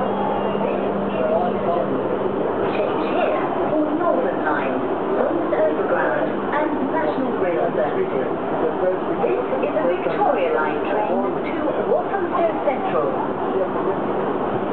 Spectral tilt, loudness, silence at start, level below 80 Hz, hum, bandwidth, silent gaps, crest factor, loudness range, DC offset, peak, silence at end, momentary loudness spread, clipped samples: -9.5 dB/octave; -21 LUFS; 0 s; -54 dBFS; none; 4.6 kHz; none; 16 dB; 1 LU; 1%; -4 dBFS; 0 s; 3 LU; under 0.1%